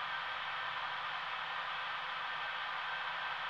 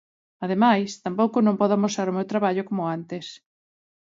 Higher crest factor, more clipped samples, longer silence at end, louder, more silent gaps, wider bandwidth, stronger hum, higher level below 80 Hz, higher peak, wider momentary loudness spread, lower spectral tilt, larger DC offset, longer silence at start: about the same, 14 dB vs 18 dB; neither; second, 0 s vs 0.65 s; second, -39 LUFS vs -23 LUFS; neither; first, 14.5 kHz vs 7.8 kHz; neither; about the same, -76 dBFS vs -72 dBFS; second, -26 dBFS vs -4 dBFS; second, 1 LU vs 14 LU; second, -1.5 dB/octave vs -6 dB/octave; neither; second, 0 s vs 0.4 s